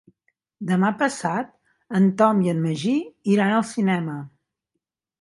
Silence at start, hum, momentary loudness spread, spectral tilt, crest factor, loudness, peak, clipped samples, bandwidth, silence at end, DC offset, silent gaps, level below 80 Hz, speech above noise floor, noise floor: 0.6 s; none; 11 LU; -6.5 dB/octave; 20 dB; -22 LUFS; -4 dBFS; under 0.1%; 11.5 kHz; 0.95 s; under 0.1%; none; -70 dBFS; 60 dB; -81 dBFS